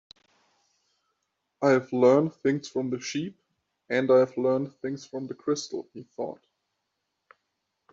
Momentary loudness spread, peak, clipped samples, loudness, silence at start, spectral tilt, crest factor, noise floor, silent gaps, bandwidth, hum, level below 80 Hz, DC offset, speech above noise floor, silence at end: 15 LU; -8 dBFS; under 0.1%; -26 LUFS; 1.6 s; -6 dB/octave; 20 dB; -81 dBFS; none; 7.8 kHz; none; -74 dBFS; under 0.1%; 55 dB; 1.6 s